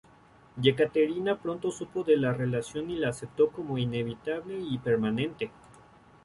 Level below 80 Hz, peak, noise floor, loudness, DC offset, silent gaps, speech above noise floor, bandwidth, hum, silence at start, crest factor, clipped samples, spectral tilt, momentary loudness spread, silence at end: -62 dBFS; -8 dBFS; -57 dBFS; -29 LUFS; under 0.1%; none; 29 dB; 11.5 kHz; none; 0.55 s; 20 dB; under 0.1%; -6.5 dB/octave; 9 LU; 0.75 s